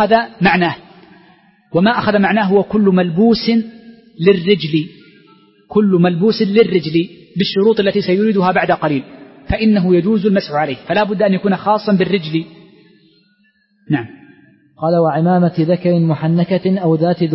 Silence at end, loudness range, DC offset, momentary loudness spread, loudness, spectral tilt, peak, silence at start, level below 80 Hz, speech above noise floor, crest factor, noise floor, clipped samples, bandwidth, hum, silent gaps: 0 s; 4 LU; under 0.1%; 8 LU; -15 LUFS; -10.5 dB/octave; 0 dBFS; 0 s; -44 dBFS; 44 dB; 14 dB; -58 dBFS; under 0.1%; 5.8 kHz; none; none